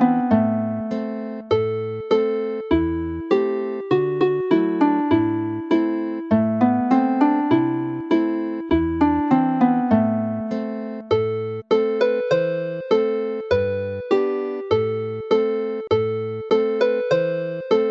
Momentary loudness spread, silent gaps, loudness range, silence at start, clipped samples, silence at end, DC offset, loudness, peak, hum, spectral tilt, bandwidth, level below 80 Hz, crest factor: 8 LU; none; 3 LU; 0 s; under 0.1%; 0 s; under 0.1%; -21 LUFS; -4 dBFS; none; -8.5 dB/octave; 7.2 kHz; -48 dBFS; 16 dB